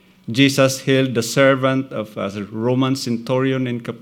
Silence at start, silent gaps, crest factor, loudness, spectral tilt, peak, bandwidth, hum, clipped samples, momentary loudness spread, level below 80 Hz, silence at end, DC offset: 0.25 s; none; 18 dB; -18 LUFS; -5 dB/octave; 0 dBFS; 17 kHz; none; under 0.1%; 11 LU; -66 dBFS; 0.05 s; under 0.1%